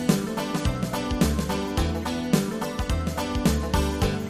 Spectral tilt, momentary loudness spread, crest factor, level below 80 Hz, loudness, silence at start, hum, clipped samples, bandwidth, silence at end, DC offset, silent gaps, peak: -5.5 dB/octave; 4 LU; 18 dB; -32 dBFS; -26 LUFS; 0 s; none; under 0.1%; 15.5 kHz; 0 s; under 0.1%; none; -8 dBFS